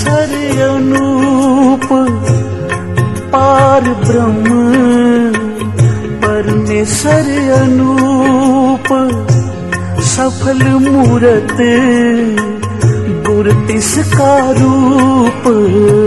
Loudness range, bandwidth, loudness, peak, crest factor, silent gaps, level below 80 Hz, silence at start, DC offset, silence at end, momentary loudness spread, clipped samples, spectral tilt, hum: 1 LU; 12.5 kHz; -10 LUFS; 0 dBFS; 10 dB; none; -36 dBFS; 0 s; 1%; 0 s; 6 LU; under 0.1%; -6 dB/octave; none